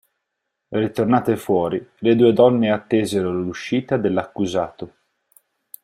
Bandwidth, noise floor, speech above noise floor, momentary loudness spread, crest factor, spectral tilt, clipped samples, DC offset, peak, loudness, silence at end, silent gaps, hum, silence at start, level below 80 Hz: 16 kHz; -78 dBFS; 59 dB; 10 LU; 18 dB; -6.5 dB/octave; under 0.1%; under 0.1%; -2 dBFS; -20 LUFS; 0.95 s; none; none; 0.7 s; -58 dBFS